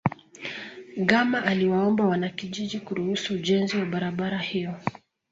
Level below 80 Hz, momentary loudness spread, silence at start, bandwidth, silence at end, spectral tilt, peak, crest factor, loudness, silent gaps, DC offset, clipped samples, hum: -62 dBFS; 13 LU; 0.05 s; 7.8 kHz; 0.4 s; -6 dB/octave; -4 dBFS; 22 dB; -26 LUFS; none; under 0.1%; under 0.1%; none